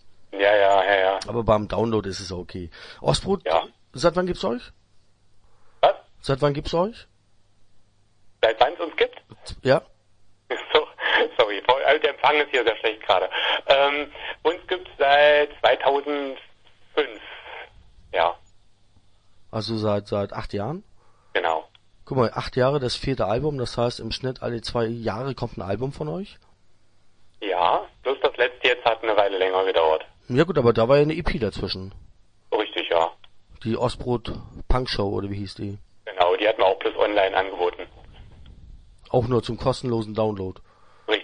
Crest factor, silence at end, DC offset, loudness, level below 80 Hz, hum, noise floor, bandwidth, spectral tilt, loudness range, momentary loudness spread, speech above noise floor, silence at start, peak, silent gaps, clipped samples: 22 dB; 0 s; under 0.1%; -23 LUFS; -42 dBFS; none; -57 dBFS; 10.5 kHz; -5.5 dB/octave; 8 LU; 14 LU; 34 dB; 0.05 s; -2 dBFS; none; under 0.1%